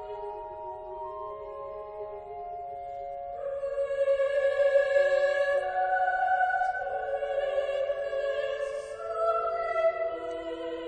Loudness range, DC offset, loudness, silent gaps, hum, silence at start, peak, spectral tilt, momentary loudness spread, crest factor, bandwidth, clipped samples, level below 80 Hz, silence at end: 11 LU; under 0.1%; -29 LUFS; none; none; 0 s; -14 dBFS; -3.5 dB/octave; 15 LU; 16 dB; 9.4 kHz; under 0.1%; -60 dBFS; 0 s